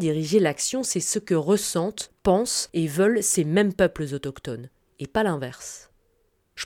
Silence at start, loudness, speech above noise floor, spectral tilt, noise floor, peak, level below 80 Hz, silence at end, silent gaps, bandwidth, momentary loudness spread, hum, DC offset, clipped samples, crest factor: 0 s; -23 LUFS; 43 dB; -4 dB/octave; -67 dBFS; -8 dBFS; -52 dBFS; 0 s; none; 18 kHz; 15 LU; none; under 0.1%; under 0.1%; 18 dB